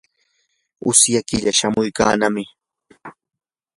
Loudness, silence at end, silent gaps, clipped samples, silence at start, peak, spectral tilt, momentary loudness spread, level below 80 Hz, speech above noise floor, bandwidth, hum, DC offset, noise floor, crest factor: -17 LUFS; 0.65 s; none; under 0.1%; 0.85 s; 0 dBFS; -2.5 dB/octave; 13 LU; -50 dBFS; 51 dB; 11.5 kHz; none; under 0.1%; -68 dBFS; 20 dB